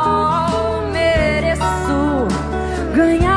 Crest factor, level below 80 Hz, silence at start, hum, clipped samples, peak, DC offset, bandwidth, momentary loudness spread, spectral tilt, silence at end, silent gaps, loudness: 14 dB; -28 dBFS; 0 s; none; under 0.1%; -2 dBFS; under 0.1%; 11 kHz; 5 LU; -6 dB/octave; 0 s; none; -17 LUFS